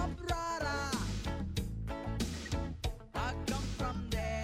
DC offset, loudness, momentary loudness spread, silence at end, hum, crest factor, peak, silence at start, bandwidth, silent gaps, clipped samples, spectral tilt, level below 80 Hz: under 0.1%; -38 LUFS; 5 LU; 0 s; none; 14 dB; -22 dBFS; 0 s; 16 kHz; none; under 0.1%; -5 dB/octave; -42 dBFS